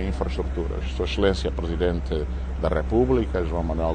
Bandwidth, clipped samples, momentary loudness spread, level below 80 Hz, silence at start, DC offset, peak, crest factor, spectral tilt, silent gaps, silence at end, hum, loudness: 9 kHz; under 0.1%; 6 LU; -28 dBFS; 0 s; under 0.1%; -8 dBFS; 16 dB; -7.5 dB/octave; none; 0 s; none; -25 LUFS